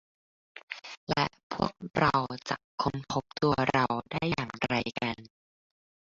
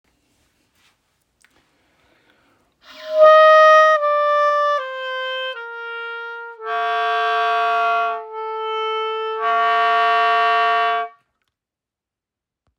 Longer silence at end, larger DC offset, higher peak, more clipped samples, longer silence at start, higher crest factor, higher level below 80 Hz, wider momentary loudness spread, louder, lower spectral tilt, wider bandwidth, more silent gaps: second, 0.85 s vs 1.7 s; neither; second, -10 dBFS vs -2 dBFS; neither; second, 0.55 s vs 2.95 s; about the same, 22 dB vs 18 dB; first, -56 dBFS vs -76 dBFS; second, 11 LU vs 19 LU; second, -30 LUFS vs -16 LUFS; first, -5.5 dB/octave vs 0 dB/octave; about the same, 7.8 kHz vs 7.2 kHz; first, 0.63-0.68 s, 0.97-1.07 s, 1.43-1.50 s, 1.90-1.94 s, 2.64-2.78 s vs none